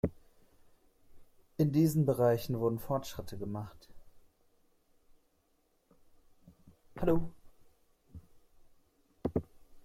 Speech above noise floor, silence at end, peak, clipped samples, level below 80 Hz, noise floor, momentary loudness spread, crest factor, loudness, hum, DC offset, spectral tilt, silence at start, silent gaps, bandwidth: 43 dB; 0.05 s; -16 dBFS; under 0.1%; -56 dBFS; -73 dBFS; 17 LU; 20 dB; -33 LUFS; none; under 0.1%; -7.5 dB/octave; 0.05 s; none; 16 kHz